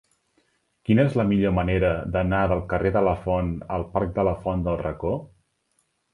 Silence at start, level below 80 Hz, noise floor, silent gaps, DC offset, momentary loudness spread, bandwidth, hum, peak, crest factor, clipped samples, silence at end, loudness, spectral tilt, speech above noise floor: 0.9 s; -38 dBFS; -71 dBFS; none; under 0.1%; 7 LU; 10.5 kHz; none; -6 dBFS; 18 dB; under 0.1%; 0.85 s; -24 LUFS; -9.5 dB/octave; 48 dB